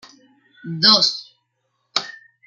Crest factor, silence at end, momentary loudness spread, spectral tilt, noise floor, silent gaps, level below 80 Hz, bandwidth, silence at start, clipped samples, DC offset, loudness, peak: 22 dB; 0.35 s; 20 LU; -2.5 dB/octave; -72 dBFS; none; -70 dBFS; 12.5 kHz; 0.65 s; under 0.1%; under 0.1%; -16 LUFS; 0 dBFS